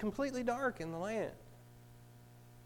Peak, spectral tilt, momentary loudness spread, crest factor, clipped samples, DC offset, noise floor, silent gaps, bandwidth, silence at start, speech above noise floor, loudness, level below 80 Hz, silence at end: -22 dBFS; -5.5 dB/octave; 23 LU; 18 dB; under 0.1%; under 0.1%; -58 dBFS; none; 19 kHz; 0 s; 20 dB; -39 LUFS; -62 dBFS; 0 s